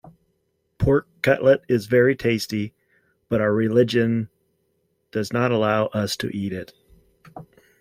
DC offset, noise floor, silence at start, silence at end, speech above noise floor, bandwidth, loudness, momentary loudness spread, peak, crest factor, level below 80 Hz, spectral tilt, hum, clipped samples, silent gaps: under 0.1%; -71 dBFS; 0.8 s; 0.4 s; 50 dB; 16.5 kHz; -21 LUFS; 12 LU; -4 dBFS; 18 dB; -48 dBFS; -6.5 dB/octave; none; under 0.1%; none